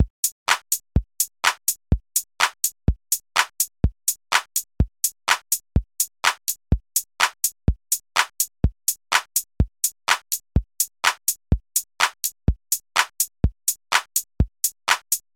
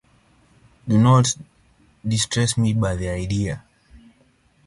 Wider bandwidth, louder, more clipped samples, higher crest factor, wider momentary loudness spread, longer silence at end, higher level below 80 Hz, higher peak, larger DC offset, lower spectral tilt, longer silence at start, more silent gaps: first, 17 kHz vs 11.5 kHz; about the same, -23 LUFS vs -21 LUFS; neither; about the same, 22 dB vs 18 dB; second, 5 LU vs 16 LU; second, 0.15 s vs 1.1 s; first, -32 dBFS vs -42 dBFS; about the same, -2 dBFS vs -4 dBFS; neither; second, -2 dB/octave vs -5 dB/octave; second, 0 s vs 0.85 s; first, 0.10-0.23 s, 0.32-0.46 s vs none